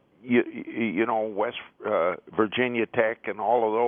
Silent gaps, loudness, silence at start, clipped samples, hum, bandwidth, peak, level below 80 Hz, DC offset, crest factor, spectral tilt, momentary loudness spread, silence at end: none; -26 LUFS; 0.25 s; under 0.1%; none; 3.7 kHz; -6 dBFS; -72 dBFS; under 0.1%; 20 dB; -9.5 dB/octave; 6 LU; 0 s